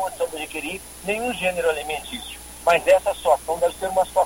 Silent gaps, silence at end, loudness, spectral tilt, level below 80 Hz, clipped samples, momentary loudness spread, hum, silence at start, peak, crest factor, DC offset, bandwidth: none; 0 s; -23 LUFS; -3 dB/octave; -48 dBFS; under 0.1%; 13 LU; none; 0 s; -4 dBFS; 18 dB; under 0.1%; 17 kHz